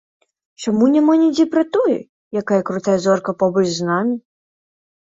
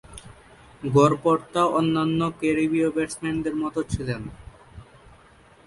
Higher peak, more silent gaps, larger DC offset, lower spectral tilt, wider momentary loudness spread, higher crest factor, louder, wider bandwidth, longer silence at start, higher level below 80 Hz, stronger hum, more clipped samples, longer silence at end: about the same, -4 dBFS vs -6 dBFS; first, 2.09-2.31 s vs none; neither; about the same, -6 dB/octave vs -6.5 dB/octave; second, 11 LU vs 14 LU; second, 14 dB vs 20 dB; first, -17 LUFS vs -23 LUFS; second, 7.8 kHz vs 11.5 kHz; first, 0.6 s vs 0.1 s; second, -62 dBFS vs -48 dBFS; neither; neither; about the same, 0.85 s vs 0.85 s